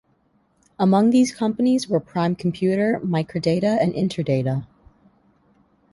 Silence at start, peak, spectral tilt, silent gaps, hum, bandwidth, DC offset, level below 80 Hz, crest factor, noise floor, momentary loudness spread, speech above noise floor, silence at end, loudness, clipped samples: 0.8 s; -6 dBFS; -7 dB/octave; none; none; 11.5 kHz; under 0.1%; -56 dBFS; 16 dB; -63 dBFS; 6 LU; 43 dB; 1.25 s; -21 LUFS; under 0.1%